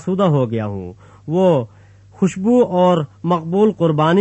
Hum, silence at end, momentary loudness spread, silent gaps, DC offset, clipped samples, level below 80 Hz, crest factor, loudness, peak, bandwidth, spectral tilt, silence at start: none; 0 s; 14 LU; none; under 0.1%; under 0.1%; -56 dBFS; 14 dB; -17 LUFS; -2 dBFS; 8.4 kHz; -8 dB/octave; 0 s